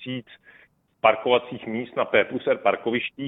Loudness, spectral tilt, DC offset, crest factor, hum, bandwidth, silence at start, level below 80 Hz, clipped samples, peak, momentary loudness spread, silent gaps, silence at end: -23 LUFS; -8.5 dB/octave; under 0.1%; 22 dB; none; 4 kHz; 0 s; -66 dBFS; under 0.1%; -2 dBFS; 10 LU; none; 0 s